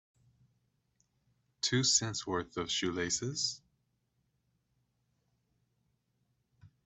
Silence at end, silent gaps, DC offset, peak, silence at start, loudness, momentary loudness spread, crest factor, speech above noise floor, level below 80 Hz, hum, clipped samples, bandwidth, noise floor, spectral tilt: 0.2 s; none; under 0.1%; -14 dBFS; 1.65 s; -32 LUFS; 9 LU; 24 dB; 45 dB; -70 dBFS; none; under 0.1%; 8.4 kHz; -79 dBFS; -2.5 dB/octave